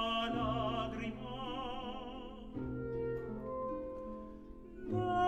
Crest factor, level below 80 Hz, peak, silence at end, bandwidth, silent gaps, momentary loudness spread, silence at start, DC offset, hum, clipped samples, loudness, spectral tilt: 16 dB; -54 dBFS; -22 dBFS; 0 s; 12 kHz; none; 13 LU; 0 s; under 0.1%; none; under 0.1%; -40 LUFS; -7 dB/octave